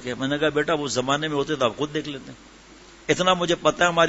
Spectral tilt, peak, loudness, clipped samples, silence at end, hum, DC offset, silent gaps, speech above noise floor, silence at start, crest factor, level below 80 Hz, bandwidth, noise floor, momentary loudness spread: -4 dB/octave; -4 dBFS; -23 LUFS; under 0.1%; 0 s; none; under 0.1%; none; 25 dB; 0 s; 20 dB; -54 dBFS; 8 kHz; -48 dBFS; 14 LU